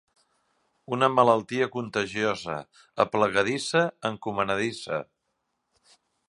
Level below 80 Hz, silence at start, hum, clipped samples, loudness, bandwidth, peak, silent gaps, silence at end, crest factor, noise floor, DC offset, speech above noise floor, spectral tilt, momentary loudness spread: -64 dBFS; 0.9 s; none; under 0.1%; -26 LUFS; 11.5 kHz; -4 dBFS; none; 1.25 s; 22 dB; -78 dBFS; under 0.1%; 52 dB; -4.5 dB/octave; 12 LU